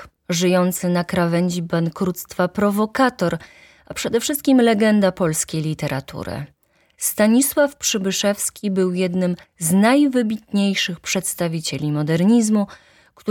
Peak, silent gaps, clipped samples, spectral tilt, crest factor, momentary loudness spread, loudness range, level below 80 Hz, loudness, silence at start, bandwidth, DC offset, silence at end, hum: -4 dBFS; none; under 0.1%; -4.5 dB/octave; 16 dB; 10 LU; 2 LU; -54 dBFS; -19 LUFS; 0 s; 18.5 kHz; under 0.1%; 0 s; none